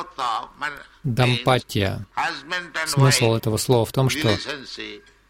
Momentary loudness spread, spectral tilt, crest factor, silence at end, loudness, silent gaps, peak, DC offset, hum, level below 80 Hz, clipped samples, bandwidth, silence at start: 13 LU; -4.5 dB/octave; 18 dB; 0.3 s; -22 LUFS; none; -4 dBFS; under 0.1%; none; -50 dBFS; under 0.1%; 16.5 kHz; 0 s